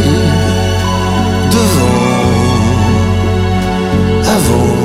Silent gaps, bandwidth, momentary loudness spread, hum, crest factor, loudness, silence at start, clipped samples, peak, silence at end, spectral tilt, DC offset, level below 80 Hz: none; 15.5 kHz; 3 LU; none; 10 dB; -11 LUFS; 0 s; under 0.1%; 0 dBFS; 0 s; -5.5 dB/octave; under 0.1%; -24 dBFS